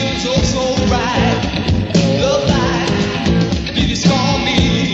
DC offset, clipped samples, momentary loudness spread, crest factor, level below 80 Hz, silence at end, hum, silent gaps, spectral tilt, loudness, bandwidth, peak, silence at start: under 0.1%; under 0.1%; 3 LU; 14 dB; -26 dBFS; 0 s; none; none; -5 dB/octave; -15 LUFS; 8 kHz; 0 dBFS; 0 s